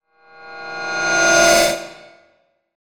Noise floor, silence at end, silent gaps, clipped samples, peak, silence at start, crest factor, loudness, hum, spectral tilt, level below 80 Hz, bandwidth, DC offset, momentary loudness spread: -61 dBFS; 1.05 s; none; under 0.1%; 0 dBFS; 0.4 s; 20 dB; -15 LUFS; none; -1 dB/octave; -48 dBFS; over 20 kHz; under 0.1%; 23 LU